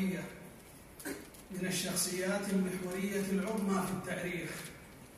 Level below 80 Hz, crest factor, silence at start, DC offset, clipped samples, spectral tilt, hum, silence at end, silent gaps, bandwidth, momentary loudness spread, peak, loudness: -64 dBFS; 16 dB; 0 s; under 0.1%; under 0.1%; -4.5 dB/octave; none; 0 s; none; 15.5 kHz; 16 LU; -20 dBFS; -36 LUFS